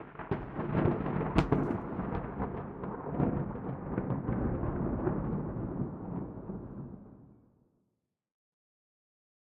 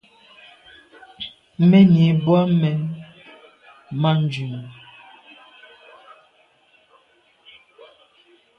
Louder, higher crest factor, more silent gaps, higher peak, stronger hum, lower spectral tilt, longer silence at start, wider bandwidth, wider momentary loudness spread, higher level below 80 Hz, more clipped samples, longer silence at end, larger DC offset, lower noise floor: second, -35 LUFS vs -18 LUFS; first, 24 dB vs 18 dB; neither; second, -10 dBFS vs -4 dBFS; neither; about the same, -8.5 dB/octave vs -9 dB/octave; second, 0 s vs 1.2 s; first, 7.4 kHz vs 5.8 kHz; second, 12 LU vs 22 LU; first, -48 dBFS vs -62 dBFS; neither; second, 2.2 s vs 3.85 s; neither; first, -82 dBFS vs -59 dBFS